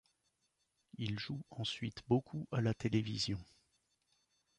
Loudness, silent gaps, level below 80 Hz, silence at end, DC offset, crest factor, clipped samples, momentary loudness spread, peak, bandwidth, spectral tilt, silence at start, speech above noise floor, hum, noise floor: -39 LUFS; none; -64 dBFS; 1.15 s; under 0.1%; 20 dB; under 0.1%; 8 LU; -20 dBFS; 10.5 kHz; -6 dB/octave; 0.95 s; 44 dB; none; -82 dBFS